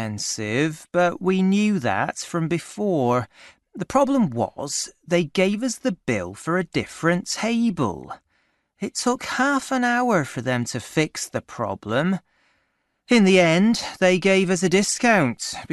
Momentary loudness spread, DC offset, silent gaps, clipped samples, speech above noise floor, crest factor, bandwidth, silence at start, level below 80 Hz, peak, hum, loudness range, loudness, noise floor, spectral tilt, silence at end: 10 LU; under 0.1%; none; under 0.1%; 49 dB; 18 dB; 12 kHz; 0 s; -58 dBFS; -4 dBFS; none; 5 LU; -22 LUFS; -71 dBFS; -4.5 dB/octave; 0 s